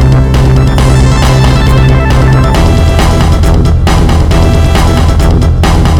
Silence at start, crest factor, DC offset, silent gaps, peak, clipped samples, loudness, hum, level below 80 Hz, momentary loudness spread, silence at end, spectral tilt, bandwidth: 0 s; 6 dB; under 0.1%; none; 0 dBFS; 1%; -7 LUFS; none; -8 dBFS; 1 LU; 0 s; -6.5 dB/octave; 15.5 kHz